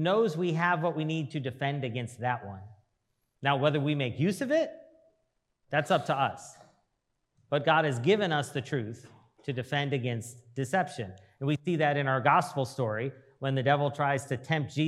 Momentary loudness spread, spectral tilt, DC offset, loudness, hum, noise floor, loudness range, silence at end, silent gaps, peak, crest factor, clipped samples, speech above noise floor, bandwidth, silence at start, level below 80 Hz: 12 LU; -6 dB/octave; under 0.1%; -29 LUFS; none; -79 dBFS; 4 LU; 0 s; none; -8 dBFS; 22 dB; under 0.1%; 50 dB; 13 kHz; 0 s; -78 dBFS